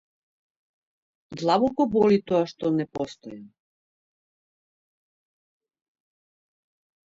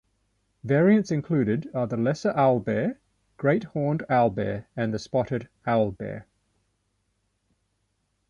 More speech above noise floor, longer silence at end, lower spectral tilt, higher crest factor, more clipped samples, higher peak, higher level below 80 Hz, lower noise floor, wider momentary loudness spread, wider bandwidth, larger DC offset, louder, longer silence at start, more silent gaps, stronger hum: first, over 66 dB vs 50 dB; first, 3.6 s vs 2.05 s; about the same, -7 dB/octave vs -8 dB/octave; about the same, 20 dB vs 18 dB; neither; about the same, -8 dBFS vs -8 dBFS; second, -64 dBFS vs -58 dBFS; first, under -90 dBFS vs -74 dBFS; first, 20 LU vs 9 LU; about the same, 7.8 kHz vs 7.4 kHz; neither; about the same, -24 LUFS vs -25 LUFS; first, 1.3 s vs 0.65 s; neither; second, none vs 50 Hz at -55 dBFS